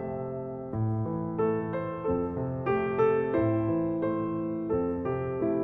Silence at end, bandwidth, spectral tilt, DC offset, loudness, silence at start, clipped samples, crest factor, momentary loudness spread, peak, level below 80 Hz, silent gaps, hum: 0 s; 4 kHz; -11 dB/octave; under 0.1%; -29 LUFS; 0 s; under 0.1%; 14 dB; 7 LU; -14 dBFS; -54 dBFS; none; none